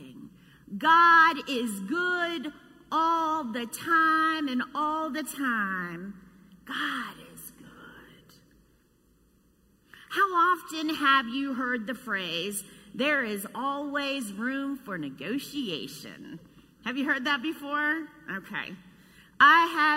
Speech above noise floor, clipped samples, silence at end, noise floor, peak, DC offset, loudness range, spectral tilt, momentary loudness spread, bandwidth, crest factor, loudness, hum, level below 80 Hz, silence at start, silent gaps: 37 dB; under 0.1%; 0 s; -64 dBFS; -6 dBFS; under 0.1%; 11 LU; -3 dB/octave; 20 LU; 16 kHz; 22 dB; -26 LUFS; none; -68 dBFS; 0 s; none